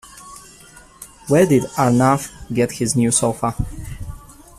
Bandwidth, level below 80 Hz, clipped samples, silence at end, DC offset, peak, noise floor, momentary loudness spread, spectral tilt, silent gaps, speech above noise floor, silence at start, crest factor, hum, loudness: 15 kHz; -40 dBFS; under 0.1%; 0.25 s; under 0.1%; -2 dBFS; -45 dBFS; 23 LU; -5.5 dB/octave; none; 28 dB; 0.15 s; 16 dB; none; -18 LUFS